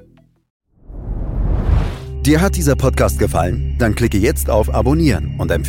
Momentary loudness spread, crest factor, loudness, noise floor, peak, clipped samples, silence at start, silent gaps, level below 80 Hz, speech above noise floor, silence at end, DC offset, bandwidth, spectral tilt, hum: 9 LU; 14 dB; -17 LUFS; -49 dBFS; -2 dBFS; under 0.1%; 0.9 s; none; -22 dBFS; 35 dB; 0 s; under 0.1%; 17 kHz; -6 dB/octave; none